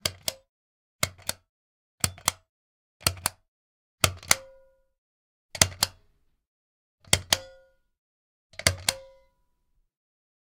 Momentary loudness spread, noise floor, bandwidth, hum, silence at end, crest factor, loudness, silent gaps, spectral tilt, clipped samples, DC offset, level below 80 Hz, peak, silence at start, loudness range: 11 LU; -71 dBFS; 17 kHz; none; 1.5 s; 32 dB; -27 LUFS; 0.49-0.99 s, 1.49-1.98 s, 2.49-3.00 s, 3.48-3.98 s, 4.98-5.49 s, 6.47-6.98 s, 7.98-8.50 s; -1 dB/octave; under 0.1%; under 0.1%; -54 dBFS; 0 dBFS; 0.05 s; 3 LU